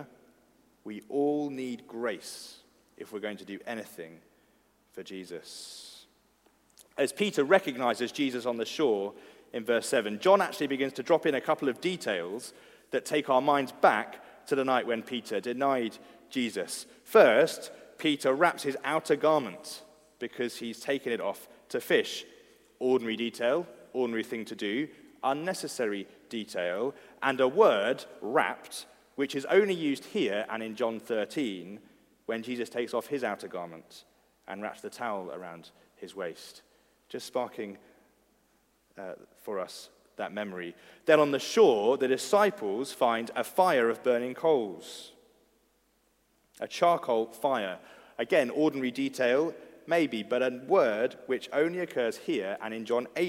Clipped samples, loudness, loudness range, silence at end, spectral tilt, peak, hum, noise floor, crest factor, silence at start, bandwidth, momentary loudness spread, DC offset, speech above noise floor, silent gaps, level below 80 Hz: under 0.1%; -29 LUFS; 14 LU; 0 s; -4 dB/octave; -6 dBFS; none; -70 dBFS; 24 dB; 0 s; 16 kHz; 18 LU; under 0.1%; 41 dB; none; -78 dBFS